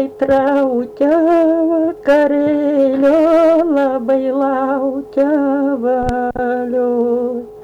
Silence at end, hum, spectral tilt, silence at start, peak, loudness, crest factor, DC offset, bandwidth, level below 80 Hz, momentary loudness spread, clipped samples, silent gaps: 0 s; none; -7.5 dB/octave; 0 s; -4 dBFS; -14 LUFS; 10 dB; under 0.1%; 8.4 kHz; -42 dBFS; 6 LU; under 0.1%; none